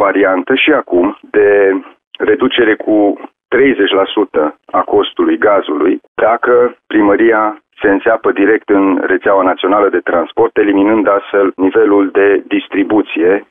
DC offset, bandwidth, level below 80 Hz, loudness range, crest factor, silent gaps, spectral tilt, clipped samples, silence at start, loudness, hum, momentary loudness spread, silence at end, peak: under 0.1%; 3.8 kHz; -50 dBFS; 1 LU; 10 dB; 2.07-2.11 s, 6.08-6.15 s; -9 dB/octave; under 0.1%; 0 s; -11 LUFS; none; 5 LU; 0.05 s; 0 dBFS